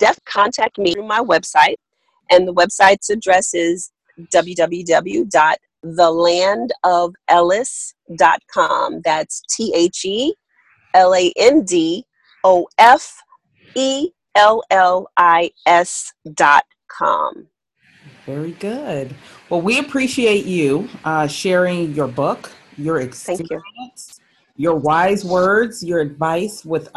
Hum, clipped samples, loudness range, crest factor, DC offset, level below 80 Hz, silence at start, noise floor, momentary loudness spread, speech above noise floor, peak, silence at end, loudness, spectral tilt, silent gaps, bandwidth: none; under 0.1%; 6 LU; 16 dB; under 0.1%; -56 dBFS; 0 s; -57 dBFS; 14 LU; 41 dB; 0 dBFS; 0.1 s; -16 LUFS; -3.5 dB/octave; none; 12.5 kHz